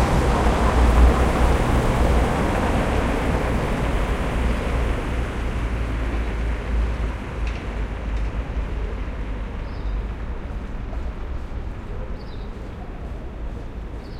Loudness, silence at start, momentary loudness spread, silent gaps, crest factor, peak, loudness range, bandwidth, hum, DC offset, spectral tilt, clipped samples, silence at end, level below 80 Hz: -24 LUFS; 0 s; 14 LU; none; 18 dB; -4 dBFS; 13 LU; 12.5 kHz; none; under 0.1%; -6.5 dB/octave; under 0.1%; 0 s; -24 dBFS